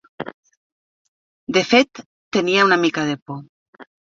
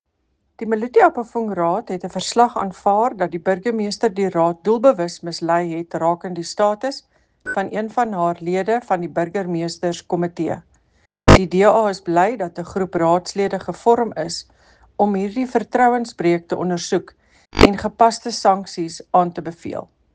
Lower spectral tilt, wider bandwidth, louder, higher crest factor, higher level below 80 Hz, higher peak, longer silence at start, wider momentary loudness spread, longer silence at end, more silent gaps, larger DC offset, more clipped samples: second, -4 dB/octave vs -5.5 dB/octave; second, 7.6 kHz vs 10 kHz; about the same, -18 LUFS vs -19 LUFS; about the same, 20 dB vs 18 dB; second, -64 dBFS vs -36 dBFS; about the same, -2 dBFS vs 0 dBFS; second, 0.2 s vs 0.6 s; first, 19 LU vs 12 LU; about the same, 0.3 s vs 0.3 s; first, 0.34-0.43 s, 0.57-1.47 s, 2.06-2.31 s, 3.22-3.26 s, 3.49-3.73 s vs none; neither; neither